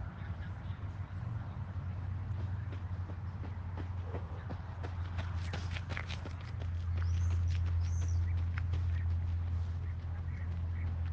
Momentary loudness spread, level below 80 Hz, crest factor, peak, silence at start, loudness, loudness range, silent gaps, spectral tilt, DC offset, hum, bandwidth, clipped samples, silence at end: 8 LU; -48 dBFS; 16 dB; -20 dBFS; 0 s; -38 LUFS; 6 LU; none; -7 dB/octave; under 0.1%; none; 7 kHz; under 0.1%; 0 s